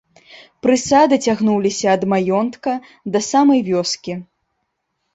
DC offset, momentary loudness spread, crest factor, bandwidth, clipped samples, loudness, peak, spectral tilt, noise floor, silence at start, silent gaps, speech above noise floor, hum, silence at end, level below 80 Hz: under 0.1%; 11 LU; 16 dB; 8.2 kHz; under 0.1%; -17 LUFS; -2 dBFS; -4.5 dB/octave; -73 dBFS; 0.35 s; none; 56 dB; none; 0.9 s; -56 dBFS